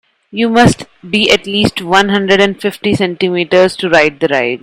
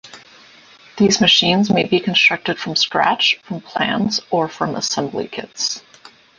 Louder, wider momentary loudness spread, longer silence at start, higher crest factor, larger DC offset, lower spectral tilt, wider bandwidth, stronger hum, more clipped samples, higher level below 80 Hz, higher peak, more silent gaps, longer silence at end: first, -11 LUFS vs -16 LUFS; second, 7 LU vs 11 LU; first, 0.35 s vs 0.05 s; second, 12 dB vs 18 dB; neither; first, -4.5 dB/octave vs -3 dB/octave; first, 17 kHz vs 10 kHz; neither; first, 0.3% vs under 0.1%; first, -42 dBFS vs -56 dBFS; about the same, 0 dBFS vs -2 dBFS; neither; second, 0.05 s vs 0.3 s